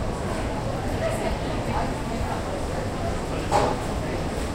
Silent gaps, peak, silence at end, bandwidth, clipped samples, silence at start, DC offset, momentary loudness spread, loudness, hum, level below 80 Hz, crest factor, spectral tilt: none; -8 dBFS; 0 s; 16 kHz; under 0.1%; 0 s; under 0.1%; 6 LU; -27 LUFS; none; -34 dBFS; 18 dB; -5.5 dB/octave